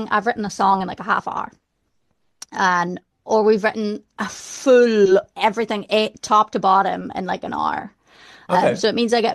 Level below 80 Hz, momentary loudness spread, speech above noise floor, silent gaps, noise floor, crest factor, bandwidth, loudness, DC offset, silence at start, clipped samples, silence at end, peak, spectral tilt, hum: -60 dBFS; 12 LU; 52 dB; none; -71 dBFS; 16 dB; 12.5 kHz; -19 LUFS; under 0.1%; 0 s; under 0.1%; 0 s; -4 dBFS; -4.5 dB/octave; none